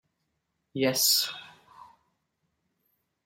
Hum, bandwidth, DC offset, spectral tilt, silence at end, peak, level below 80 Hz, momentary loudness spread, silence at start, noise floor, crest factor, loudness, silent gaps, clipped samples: none; 16 kHz; under 0.1%; -1.5 dB/octave; 1.8 s; -12 dBFS; -76 dBFS; 19 LU; 0.75 s; -79 dBFS; 22 dB; -24 LUFS; none; under 0.1%